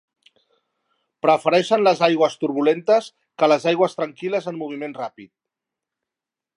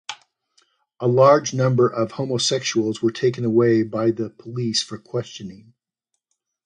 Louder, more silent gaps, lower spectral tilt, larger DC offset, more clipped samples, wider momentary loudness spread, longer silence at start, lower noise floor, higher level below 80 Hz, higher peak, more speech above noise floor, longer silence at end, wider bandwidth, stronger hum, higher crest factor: about the same, -20 LUFS vs -20 LUFS; neither; about the same, -5 dB/octave vs -5 dB/octave; neither; neither; about the same, 13 LU vs 15 LU; first, 1.25 s vs 0.1 s; first, -88 dBFS vs -79 dBFS; second, -78 dBFS vs -64 dBFS; about the same, -2 dBFS vs -2 dBFS; first, 68 dB vs 59 dB; first, 1.3 s vs 1.1 s; about the same, 11 kHz vs 10 kHz; neither; about the same, 20 dB vs 20 dB